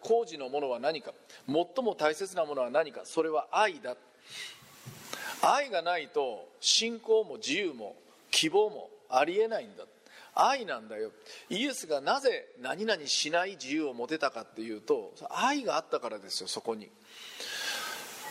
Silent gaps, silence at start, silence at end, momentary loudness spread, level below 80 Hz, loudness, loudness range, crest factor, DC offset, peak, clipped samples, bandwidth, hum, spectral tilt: none; 0 s; 0 s; 16 LU; -84 dBFS; -31 LUFS; 4 LU; 22 dB; under 0.1%; -10 dBFS; under 0.1%; 16 kHz; none; -2 dB/octave